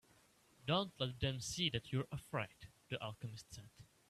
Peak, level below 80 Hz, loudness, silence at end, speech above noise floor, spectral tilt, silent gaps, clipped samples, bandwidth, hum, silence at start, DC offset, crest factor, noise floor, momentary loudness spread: -24 dBFS; -64 dBFS; -42 LUFS; 0.25 s; 28 dB; -4.5 dB/octave; none; under 0.1%; 14 kHz; none; 0.65 s; under 0.1%; 20 dB; -71 dBFS; 17 LU